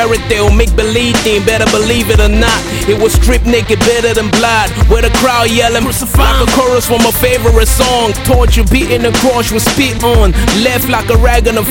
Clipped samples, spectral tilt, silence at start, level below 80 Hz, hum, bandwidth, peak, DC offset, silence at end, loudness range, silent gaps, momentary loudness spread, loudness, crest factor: 0.2%; -4.5 dB/octave; 0 s; -14 dBFS; none; 17.5 kHz; 0 dBFS; under 0.1%; 0 s; 1 LU; none; 2 LU; -10 LUFS; 8 dB